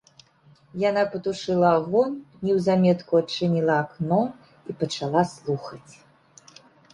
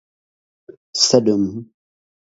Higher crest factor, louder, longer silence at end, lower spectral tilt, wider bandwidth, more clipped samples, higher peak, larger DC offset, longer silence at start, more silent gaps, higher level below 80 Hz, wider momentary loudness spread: about the same, 20 dB vs 22 dB; second, -24 LUFS vs -17 LUFS; first, 1.15 s vs 0.7 s; first, -6.5 dB/octave vs -4 dB/octave; first, 11 kHz vs 8 kHz; neither; second, -4 dBFS vs 0 dBFS; neither; second, 0.75 s vs 0.95 s; neither; about the same, -62 dBFS vs -58 dBFS; second, 11 LU vs 15 LU